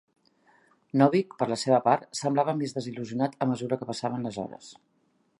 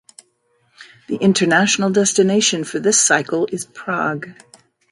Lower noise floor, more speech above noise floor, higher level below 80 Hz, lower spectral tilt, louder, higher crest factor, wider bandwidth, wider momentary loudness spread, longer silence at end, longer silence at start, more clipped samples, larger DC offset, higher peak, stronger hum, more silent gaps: about the same, -64 dBFS vs -63 dBFS; second, 37 dB vs 46 dB; second, -72 dBFS vs -64 dBFS; first, -6 dB/octave vs -3 dB/octave; second, -27 LUFS vs -16 LUFS; about the same, 22 dB vs 18 dB; about the same, 11.5 kHz vs 11.5 kHz; about the same, 12 LU vs 12 LU; about the same, 0.65 s vs 0.6 s; first, 0.95 s vs 0.8 s; neither; neither; second, -6 dBFS vs -2 dBFS; neither; neither